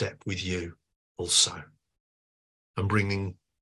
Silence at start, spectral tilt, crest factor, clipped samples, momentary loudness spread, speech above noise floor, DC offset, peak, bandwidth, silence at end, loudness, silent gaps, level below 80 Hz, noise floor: 0 s; -3 dB/octave; 24 dB; under 0.1%; 17 LU; over 61 dB; under 0.1%; -8 dBFS; 12.5 kHz; 0.3 s; -27 LUFS; 0.96-1.15 s, 2.00-2.74 s; -50 dBFS; under -90 dBFS